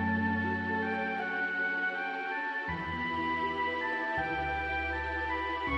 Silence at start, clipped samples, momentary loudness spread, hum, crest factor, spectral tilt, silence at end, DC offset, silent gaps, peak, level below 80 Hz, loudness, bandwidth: 0 s; under 0.1%; 3 LU; none; 14 dB; -6.5 dB/octave; 0 s; under 0.1%; none; -20 dBFS; -50 dBFS; -32 LUFS; 9.4 kHz